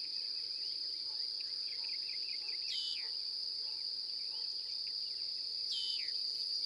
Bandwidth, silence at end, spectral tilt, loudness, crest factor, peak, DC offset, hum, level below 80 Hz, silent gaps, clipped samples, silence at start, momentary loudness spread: 15 kHz; 0 s; 1.5 dB/octave; -37 LUFS; 14 dB; -26 dBFS; under 0.1%; none; -84 dBFS; none; under 0.1%; 0 s; 2 LU